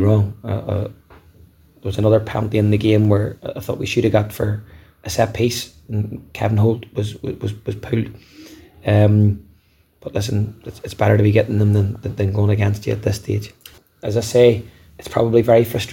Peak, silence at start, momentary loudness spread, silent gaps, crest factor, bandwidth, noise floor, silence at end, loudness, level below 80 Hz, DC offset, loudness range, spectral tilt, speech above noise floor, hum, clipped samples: 0 dBFS; 0 s; 14 LU; none; 18 dB; 16.5 kHz; -56 dBFS; 0 s; -19 LUFS; -44 dBFS; under 0.1%; 4 LU; -7 dB/octave; 38 dB; none; under 0.1%